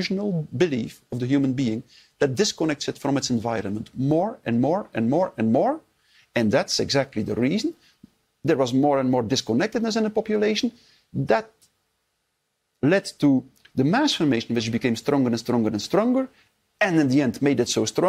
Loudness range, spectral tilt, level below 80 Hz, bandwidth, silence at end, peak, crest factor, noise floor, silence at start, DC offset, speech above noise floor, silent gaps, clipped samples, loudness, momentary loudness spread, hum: 3 LU; -5.5 dB/octave; -60 dBFS; 15 kHz; 0 s; -6 dBFS; 16 dB; -75 dBFS; 0 s; under 0.1%; 53 dB; none; under 0.1%; -23 LUFS; 7 LU; none